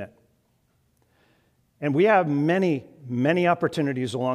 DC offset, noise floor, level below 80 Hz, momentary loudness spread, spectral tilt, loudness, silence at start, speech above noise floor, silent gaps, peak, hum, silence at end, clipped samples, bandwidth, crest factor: under 0.1%; -67 dBFS; -70 dBFS; 12 LU; -7 dB/octave; -23 LUFS; 0 s; 45 dB; none; -6 dBFS; none; 0 s; under 0.1%; 13 kHz; 18 dB